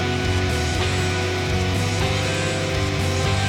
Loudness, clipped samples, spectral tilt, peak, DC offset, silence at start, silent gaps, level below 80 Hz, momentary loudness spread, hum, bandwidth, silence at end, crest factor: -22 LUFS; under 0.1%; -4.5 dB/octave; -10 dBFS; under 0.1%; 0 s; none; -34 dBFS; 1 LU; none; 15.5 kHz; 0 s; 12 dB